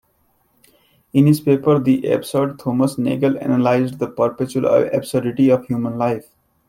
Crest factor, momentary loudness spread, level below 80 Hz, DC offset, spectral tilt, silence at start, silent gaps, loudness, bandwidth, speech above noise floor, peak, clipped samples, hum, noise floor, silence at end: 16 dB; 6 LU; -58 dBFS; under 0.1%; -7.5 dB/octave; 1.15 s; none; -18 LUFS; 16 kHz; 45 dB; -2 dBFS; under 0.1%; none; -62 dBFS; 0.5 s